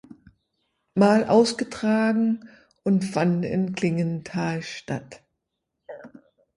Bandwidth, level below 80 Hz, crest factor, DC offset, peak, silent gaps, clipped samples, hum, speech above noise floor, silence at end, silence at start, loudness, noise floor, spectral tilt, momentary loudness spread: 11.5 kHz; -62 dBFS; 20 dB; under 0.1%; -4 dBFS; none; under 0.1%; none; 58 dB; 0.5 s; 0.95 s; -23 LUFS; -80 dBFS; -6.5 dB/octave; 14 LU